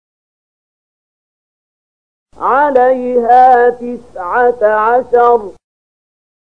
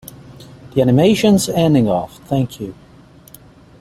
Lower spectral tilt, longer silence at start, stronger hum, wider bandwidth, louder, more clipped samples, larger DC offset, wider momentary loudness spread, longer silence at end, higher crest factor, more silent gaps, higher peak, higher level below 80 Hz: about the same, -6 dB/octave vs -6 dB/octave; first, 2.4 s vs 0.3 s; first, 50 Hz at -55 dBFS vs none; second, 5.4 kHz vs 16 kHz; first, -10 LUFS vs -15 LUFS; neither; first, 0.7% vs under 0.1%; about the same, 15 LU vs 16 LU; about the same, 1 s vs 1.1 s; about the same, 14 dB vs 16 dB; neither; about the same, 0 dBFS vs -2 dBFS; about the same, -52 dBFS vs -48 dBFS